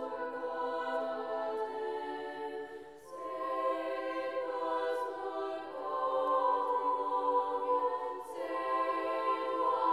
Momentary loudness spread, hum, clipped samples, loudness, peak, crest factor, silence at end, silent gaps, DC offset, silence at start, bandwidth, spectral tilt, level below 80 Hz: 9 LU; none; under 0.1%; -35 LUFS; -20 dBFS; 14 dB; 0 s; none; under 0.1%; 0 s; 12.5 kHz; -4 dB/octave; -78 dBFS